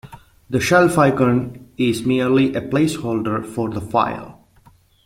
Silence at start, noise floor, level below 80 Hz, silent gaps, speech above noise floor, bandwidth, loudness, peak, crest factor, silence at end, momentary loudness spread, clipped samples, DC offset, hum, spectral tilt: 0.05 s; -52 dBFS; -50 dBFS; none; 35 dB; 16.5 kHz; -18 LUFS; -2 dBFS; 18 dB; 0.75 s; 10 LU; under 0.1%; under 0.1%; none; -6 dB/octave